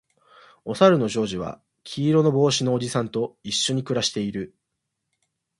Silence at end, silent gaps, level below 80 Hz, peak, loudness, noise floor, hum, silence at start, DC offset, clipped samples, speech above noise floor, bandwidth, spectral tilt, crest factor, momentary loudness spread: 1.1 s; none; -60 dBFS; -2 dBFS; -22 LUFS; -80 dBFS; none; 0.65 s; under 0.1%; under 0.1%; 58 dB; 11.5 kHz; -5 dB/octave; 22 dB; 17 LU